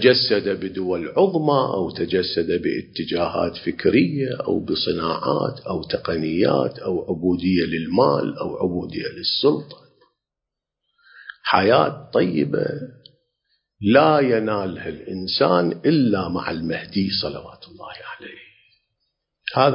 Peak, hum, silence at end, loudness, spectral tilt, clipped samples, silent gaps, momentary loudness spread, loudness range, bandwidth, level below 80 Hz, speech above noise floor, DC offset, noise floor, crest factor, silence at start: -2 dBFS; none; 0 s; -21 LUFS; -10 dB/octave; under 0.1%; none; 13 LU; 4 LU; 5.4 kHz; -50 dBFS; 64 dB; under 0.1%; -85 dBFS; 20 dB; 0 s